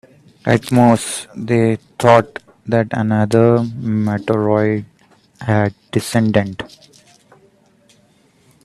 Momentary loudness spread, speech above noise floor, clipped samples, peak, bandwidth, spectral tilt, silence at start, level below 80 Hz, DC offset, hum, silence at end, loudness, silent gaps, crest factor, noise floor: 13 LU; 39 dB; under 0.1%; 0 dBFS; 13.5 kHz; -6.5 dB/octave; 0.45 s; -52 dBFS; under 0.1%; none; 2 s; -16 LUFS; none; 16 dB; -54 dBFS